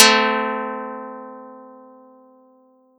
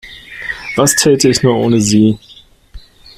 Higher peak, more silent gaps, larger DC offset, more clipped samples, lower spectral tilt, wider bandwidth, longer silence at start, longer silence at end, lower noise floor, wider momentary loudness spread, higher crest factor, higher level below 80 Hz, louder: about the same, 0 dBFS vs 0 dBFS; neither; neither; neither; second, -1 dB/octave vs -4 dB/octave; first, 18 kHz vs 16 kHz; about the same, 0 s vs 0.05 s; first, 1.3 s vs 0.4 s; first, -55 dBFS vs -36 dBFS; first, 25 LU vs 15 LU; first, 22 dB vs 14 dB; second, under -90 dBFS vs -42 dBFS; second, -19 LUFS vs -11 LUFS